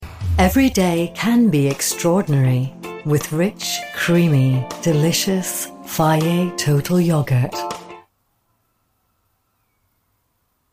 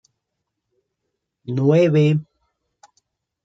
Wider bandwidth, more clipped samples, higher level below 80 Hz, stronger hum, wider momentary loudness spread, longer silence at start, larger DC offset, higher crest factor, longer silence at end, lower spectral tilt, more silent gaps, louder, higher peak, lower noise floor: first, 15.5 kHz vs 7.6 kHz; neither; first, -38 dBFS vs -66 dBFS; neither; second, 9 LU vs 13 LU; second, 0 s vs 1.5 s; neither; about the same, 16 dB vs 18 dB; first, 2.75 s vs 1.25 s; second, -5.5 dB/octave vs -8.5 dB/octave; neither; about the same, -18 LUFS vs -18 LUFS; about the same, -4 dBFS vs -4 dBFS; second, -68 dBFS vs -79 dBFS